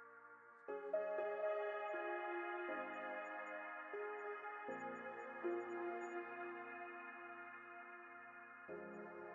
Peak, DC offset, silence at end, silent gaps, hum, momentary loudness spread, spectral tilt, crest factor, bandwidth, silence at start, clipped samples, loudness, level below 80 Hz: -32 dBFS; under 0.1%; 0 s; none; none; 12 LU; -2.5 dB/octave; 16 dB; 7 kHz; 0 s; under 0.1%; -48 LUFS; under -90 dBFS